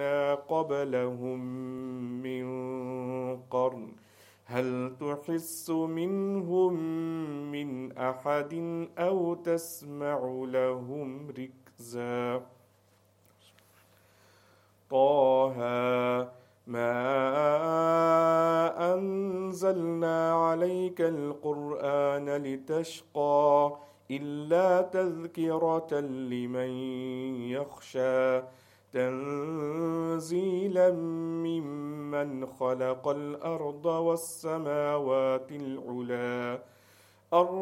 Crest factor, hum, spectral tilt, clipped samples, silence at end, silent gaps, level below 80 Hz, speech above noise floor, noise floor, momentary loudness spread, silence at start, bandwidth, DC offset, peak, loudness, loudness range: 20 dB; none; -6.5 dB/octave; under 0.1%; 0 s; none; -80 dBFS; 36 dB; -65 dBFS; 12 LU; 0 s; 16.5 kHz; under 0.1%; -10 dBFS; -30 LUFS; 8 LU